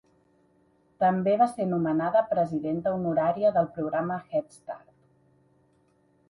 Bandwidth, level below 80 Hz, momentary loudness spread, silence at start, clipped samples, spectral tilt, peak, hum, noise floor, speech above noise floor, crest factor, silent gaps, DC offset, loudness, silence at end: 11.5 kHz; -66 dBFS; 8 LU; 1 s; under 0.1%; -8.5 dB/octave; -10 dBFS; none; -66 dBFS; 40 dB; 18 dB; none; under 0.1%; -26 LUFS; 1.5 s